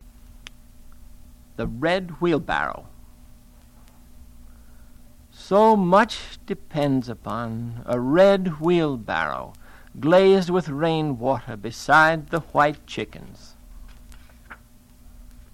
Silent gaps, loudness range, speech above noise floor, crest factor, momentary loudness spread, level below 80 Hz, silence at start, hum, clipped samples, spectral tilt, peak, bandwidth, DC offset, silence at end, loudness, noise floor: none; 8 LU; 29 dB; 18 dB; 17 LU; -46 dBFS; 0.05 s; none; under 0.1%; -6.5 dB/octave; -6 dBFS; 16 kHz; under 0.1%; 0.3 s; -21 LUFS; -50 dBFS